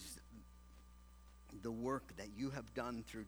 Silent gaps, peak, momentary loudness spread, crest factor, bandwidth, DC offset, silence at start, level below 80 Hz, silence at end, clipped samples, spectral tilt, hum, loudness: none; -28 dBFS; 20 LU; 20 dB; over 20 kHz; under 0.1%; 0 s; -62 dBFS; 0 s; under 0.1%; -5.5 dB/octave; 60 Hz at -60 dBFS; -46 LUFS